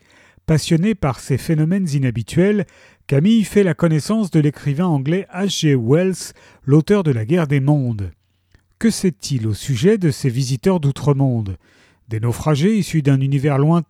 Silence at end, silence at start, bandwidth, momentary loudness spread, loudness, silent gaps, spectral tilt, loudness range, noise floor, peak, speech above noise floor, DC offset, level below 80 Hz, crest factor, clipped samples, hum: 0.05 s; 0.5 s; 14.5 kHz; 8 LU; -18 LUFS; none; -7 dB/octave; 2 LU; -57 dBFS; -2 dBFS; 40 dB; under 0.1%; -46 dBFS; 14 dB; under 0.1%; none